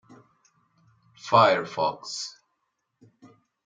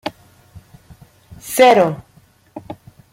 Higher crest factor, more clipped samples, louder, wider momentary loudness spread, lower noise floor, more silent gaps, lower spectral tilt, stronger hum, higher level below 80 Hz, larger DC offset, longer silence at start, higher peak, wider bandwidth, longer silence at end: first, 24 dB vs 18 dB; neither; second, -23 LUFS vs -13 LUFS; second, 18 LU vs 27 LU; first, -78 dBFS vs -52 dBFS; neither; about the same, -4 dB/octave vs -4 dB/octave; neither; second, -74 dBFS vs -54 dBFS; neither; first, 1.25 s vs 0.05 s; second, -6 dBFS vs -2 dBFS; second, 9.4 kHz vs 16.5 kHz; first, 1.35 s vs 0.4 s